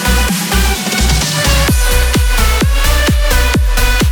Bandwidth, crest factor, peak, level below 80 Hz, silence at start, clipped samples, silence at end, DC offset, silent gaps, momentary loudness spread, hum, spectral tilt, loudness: 19.5 kHz; 10 dB; 0 dBFS; -12 dBFS; 0 s; under 0.1%; 0 s; under 0.1%; none; 2 LU; none; -3.5 dB/octave; -12 LUFS